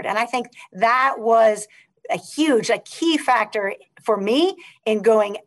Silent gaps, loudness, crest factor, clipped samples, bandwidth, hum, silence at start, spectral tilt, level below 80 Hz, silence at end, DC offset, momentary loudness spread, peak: none; -20 LUFS; 16 dB; under 0.1%; 12.5 kHz; none; 0 s; -3.5 dB/octave; -74 dBFS; 0.05 s; under 0.1%; 11 LU; -6 dBFS